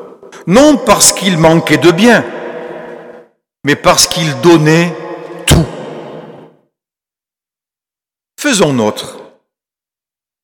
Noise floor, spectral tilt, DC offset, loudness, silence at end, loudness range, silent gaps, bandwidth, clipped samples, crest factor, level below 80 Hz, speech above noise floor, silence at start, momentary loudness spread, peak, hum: -89 dBFS; -4 dB/octave; under 0.1%; -9 LUFS; 1.2 s; 9 LU; none; over 20 kHz; 0.5%; 12 dB; -32 dBFS; 80 dB; 0 s; 20 LU; 0 dBFS; none